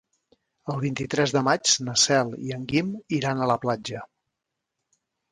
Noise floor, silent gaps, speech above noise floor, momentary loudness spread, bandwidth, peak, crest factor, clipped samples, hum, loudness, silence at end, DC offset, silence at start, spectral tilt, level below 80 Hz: -83 dBFS; none; 59 dB; 13 LU; 11.5 kHz; -6 dBFS; 20 dB; under 0.1%; none; -24 LUFS; 1.25 s; under 0.1%; 0.65 s; -3.5 dB/octave; -62 dBFS